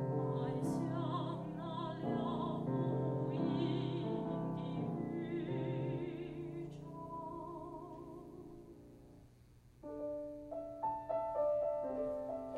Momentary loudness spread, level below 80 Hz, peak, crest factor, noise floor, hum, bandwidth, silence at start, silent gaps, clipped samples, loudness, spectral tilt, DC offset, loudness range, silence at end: 14 LU; -66 dBFS; -24 dBFS; 16 dB; -63 dBFS; none; 11.5 kHz; 0 s; none; under 0.1%; -40 LUFS; -8.5 dB/octave; under 0.1%; 11 LU; 0 s